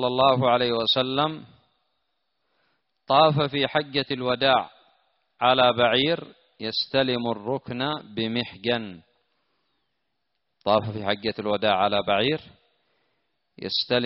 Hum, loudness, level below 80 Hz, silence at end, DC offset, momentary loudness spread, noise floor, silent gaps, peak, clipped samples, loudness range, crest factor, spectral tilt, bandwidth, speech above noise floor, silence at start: none; -23 LUFS; -62 dBFS; 0 s; under 0.1%; 10 LU; -79 dBFS; none; -6 dBFS; under 0.1%; 6 LU; 20 dB; -2.5 dB/octave; 5.8 kHz; 56 dB; 0 s